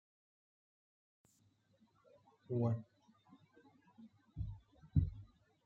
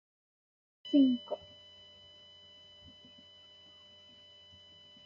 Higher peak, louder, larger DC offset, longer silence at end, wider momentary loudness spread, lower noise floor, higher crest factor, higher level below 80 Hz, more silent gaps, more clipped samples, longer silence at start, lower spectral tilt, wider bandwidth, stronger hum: second, -20 dBFS vs -16 dBFS; second, -41 LUFS vs -30 LUFS; neither; second, 0.4 s vs 3.7 s; about the same, 25 LU vs 27 LU; first, -75 dBFS vs -58 dBFS; about the same, 24 dB vs 20 dB; first, -56 dBFS vs -80 dBFS; neither; neither; first, 2.5 s vs 0.85 s; first, -11 dB/octave vs -4.5 dB/octave; second, 4.4 kHz vs 5.4 kHz; neither